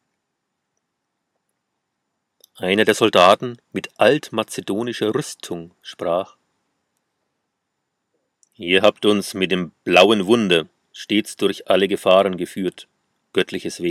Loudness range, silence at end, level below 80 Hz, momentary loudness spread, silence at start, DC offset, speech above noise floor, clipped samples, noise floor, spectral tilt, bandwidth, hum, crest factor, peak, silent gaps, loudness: 9 LU; 0 s; -66 dBFS; 16 LU; 2.6 s; under 0.1%; 58 dB; under 0.1%; -77 dBFS; -4.5 dB/octave; 15.5 kHz; none; 20 dB; 0 dBFS; none; -18 LUFS